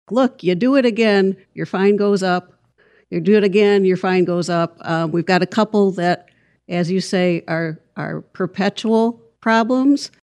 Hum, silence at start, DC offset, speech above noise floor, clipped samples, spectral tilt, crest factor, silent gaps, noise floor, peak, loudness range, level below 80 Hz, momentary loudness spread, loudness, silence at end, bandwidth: none; 0.1 s; under 0.1%; 39 dB; under 0.1%; -6.5 dB/octave; 16 dB; none; -56 dBFS; -2 dBFS; 4 LU; -70 dBFS; 11 LU; -18 LUFS; 0.15 s; 11 kHz